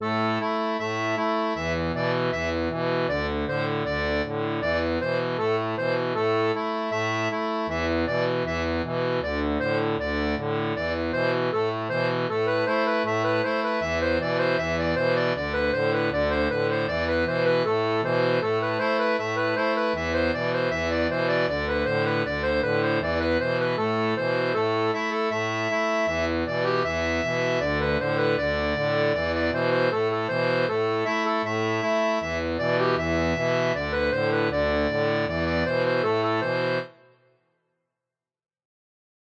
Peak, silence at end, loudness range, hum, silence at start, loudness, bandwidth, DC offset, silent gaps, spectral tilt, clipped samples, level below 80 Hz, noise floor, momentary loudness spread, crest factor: -12 dBFS; 2.35 s; 2 LU; none; 0 s; -25 LUFS; 8 kHz; under 0.1%; none; -6 dB/octave; under 0.1%; -44 dBFS; -89 dBFS; 3 LU; 14 dB